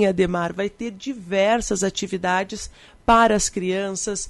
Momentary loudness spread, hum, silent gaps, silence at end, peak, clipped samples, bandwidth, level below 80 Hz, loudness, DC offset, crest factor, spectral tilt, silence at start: 14 LU; none; none; 0 s; -4 dBFS; under 0.1%; 11.5 kHz; -42 dBFS; -21 LUFS; under 0.1%; 18 dB; -4 dB/octave; 0 s